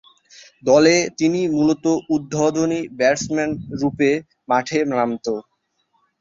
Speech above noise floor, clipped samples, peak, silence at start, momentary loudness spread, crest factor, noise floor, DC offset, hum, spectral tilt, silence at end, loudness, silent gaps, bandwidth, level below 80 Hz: 48 dB; under 0.1%; -2 dBFS; 0.65 s; 10 LU; 18 dB; -67 dBFS; under 0.1%; none; -5 dB/octave; 0.8 s; -19 LUFS; none; 7.8 kHz; -56 dBFS